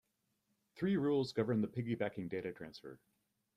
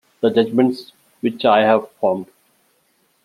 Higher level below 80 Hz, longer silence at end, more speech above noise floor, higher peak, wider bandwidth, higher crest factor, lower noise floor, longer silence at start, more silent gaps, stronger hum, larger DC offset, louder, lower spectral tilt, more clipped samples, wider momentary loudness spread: second, -74 dBFS vs -66 dBFS; second, 0.6 s vs 1 s; about the same, 45 dB vs 46 dB; second, -22 dBFS vs -2 dBFS; second, 11.5 kHz vs 14 kHz; about the same, 18 dB vs 18 dB; first, -82 dBFS vs -62 dBFS; first, 0.75 s vs 0.2 s; neither; neither; neither; second, -38 LUFS vs -18 LUFS; about the same, -7.5 dB/octave vs -7 dB/octave; neither; first, 16 LU vs 11 LU